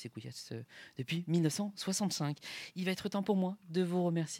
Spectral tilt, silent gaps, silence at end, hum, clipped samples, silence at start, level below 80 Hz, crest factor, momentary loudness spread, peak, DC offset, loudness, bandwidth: -5 dB/octave; none; 0 s; none; under 0.1%; 0 s; -78 dBFS; 18 dB; 13 LU; -18 dBFS; under 0.1%; -36 LUFS; 16.5 kHz